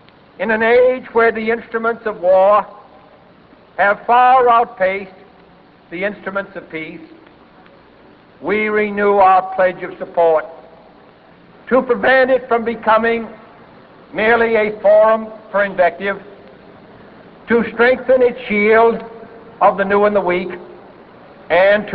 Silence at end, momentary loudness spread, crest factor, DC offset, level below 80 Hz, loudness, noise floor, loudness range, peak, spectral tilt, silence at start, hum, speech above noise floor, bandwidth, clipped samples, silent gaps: 0 s; 16 LU; 14 dB; under 0.1%; -52 dBFS; -15 LUFS; -46 dBFS; 4 LU; -2 dBFS; -9 dB/octave; 0.4 s; none; 32 dB; 5 kHz; under 0.1%; none